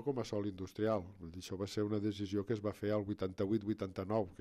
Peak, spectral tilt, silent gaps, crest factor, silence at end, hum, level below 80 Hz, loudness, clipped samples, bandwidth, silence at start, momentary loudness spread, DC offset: -22 dBFS; -7 dB/octave; none; 16 dB; 0.05 s; none; -68 dBFS; -39 LUFS; under 0.1%; 14.5 kHz; 0 s; 6 LU; under 0.1%